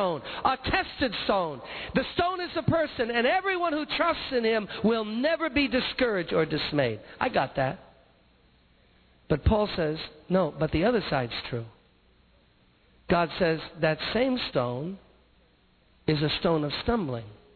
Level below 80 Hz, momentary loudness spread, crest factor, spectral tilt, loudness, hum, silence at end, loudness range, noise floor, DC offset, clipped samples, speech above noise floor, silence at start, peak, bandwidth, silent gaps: -46 dBFS; 7 LU; 18 dB; -8.5 dB/octave; -27 LUFS; none; 0.2 s; 4 LU; -63 dBFS; under 0.1%; under 0.1%; 36 dB; 0 s; -10 dBFS; 4.6 kHz; none